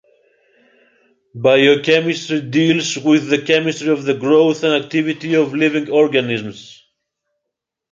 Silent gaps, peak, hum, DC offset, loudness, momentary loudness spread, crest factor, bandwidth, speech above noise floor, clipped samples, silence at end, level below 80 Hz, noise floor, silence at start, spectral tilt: none; -2 dBFS; none; under 0.1%; -15 LUFS; 7 LU; 16 dB; 7.6 kHz; 65 dB; under 0.1%; 1.2 s; -64 dBFS; -80 dBFS; 1.35 s; -5 dB/octave